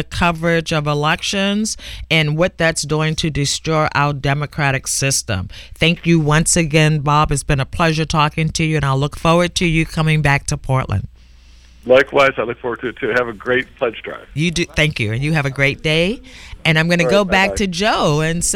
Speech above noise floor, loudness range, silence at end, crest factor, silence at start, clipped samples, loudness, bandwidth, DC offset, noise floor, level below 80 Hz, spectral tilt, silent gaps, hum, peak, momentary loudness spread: 27 dB; 3 LU; 0 s; 16 dB; 0 s; under 0.1%; -16 LUFS; 16 kHz; under 0.1%; -43 dBFS; -34 dBFS; -4.5 dB/octave; none; none; 0 dBFS; 9 LU